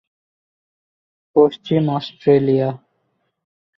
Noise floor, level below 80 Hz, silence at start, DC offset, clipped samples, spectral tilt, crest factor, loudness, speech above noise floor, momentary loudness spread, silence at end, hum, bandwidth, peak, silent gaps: -69 dBFS; -60 dBFS; 1.35 s; under 0.1%; under 0.1%; -9.5 dB/octave; 18 dB; -18 LUFS; 53 dB; 8 LU; 1 s; none; 6 kHz; -2 dBFS; none